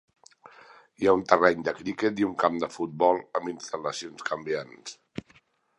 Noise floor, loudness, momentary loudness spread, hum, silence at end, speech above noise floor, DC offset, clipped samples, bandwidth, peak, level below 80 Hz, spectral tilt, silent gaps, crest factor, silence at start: -62 dBFS; -27 LUFS; 19 LU; none; 0.6 s; 36 dB; under 0.1%; under 0.1%; 11 kHz; -2 dBFS; -64 dBFS; -5 dB/octave; none; 26 dB; 1 s